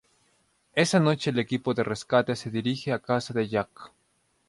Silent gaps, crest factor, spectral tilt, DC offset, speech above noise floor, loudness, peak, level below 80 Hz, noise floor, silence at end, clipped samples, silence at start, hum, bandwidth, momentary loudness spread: none; 20 dB; -5.5 dB/octave; under 0.1%; 44 dB; -26 LUFS; -8 dBFS; -64 dBFS; -70 dBFS; 0.6 s; under 0.1%; 0.75 s; none; 11.5 kHz; 7 LU